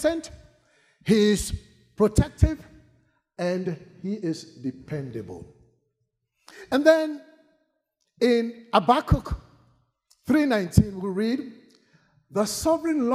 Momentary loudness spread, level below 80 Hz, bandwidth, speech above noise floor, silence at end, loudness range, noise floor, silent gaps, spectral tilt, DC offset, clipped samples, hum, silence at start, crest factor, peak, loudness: 17 LU; -40 dBFS; 15.5 kHz; 54 dB; 0 s; 9 LU; -77 dBFS; none; -6 dB/octave; under 0.1%; under 0.1%; none; 0 s; 22 dB; -2 dBFS; -24 LUFS